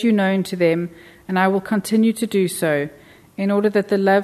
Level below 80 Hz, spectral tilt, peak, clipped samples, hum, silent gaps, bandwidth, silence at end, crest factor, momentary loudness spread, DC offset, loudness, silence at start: -62 dBFS; -6 dB/octave; -4 dBFS; under 0.1%; none; none; 13.5 kHz; 0 s; 14 dB; 7 LU; under 0.1%; -19 LUFS; 0 s